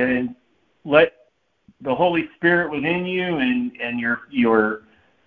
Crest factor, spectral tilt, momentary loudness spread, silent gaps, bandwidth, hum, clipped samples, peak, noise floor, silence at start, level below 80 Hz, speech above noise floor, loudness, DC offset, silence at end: 20 dB; -8.5 dB/octave; 10 LU; none; 4.6 kHz; none; under 0.1%; 0 dBFS; -58 dBFS; 0 s; -56 dBFS; 38 dB; -20 LUFS; under 0.1%; 0.5 s